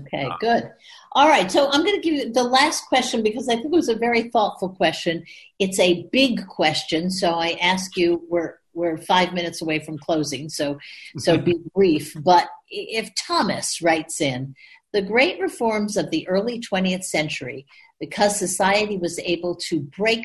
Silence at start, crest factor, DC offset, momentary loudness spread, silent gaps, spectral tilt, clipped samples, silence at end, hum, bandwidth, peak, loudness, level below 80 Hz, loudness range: 0 s; 18 dB; under 0.1%; 9 LU; none; -4 dB/octave; under 0.1%; 0 s; none; 12.5 kHz; -4 dBFS; -21 LUFS; -58 dBFS; 4 LU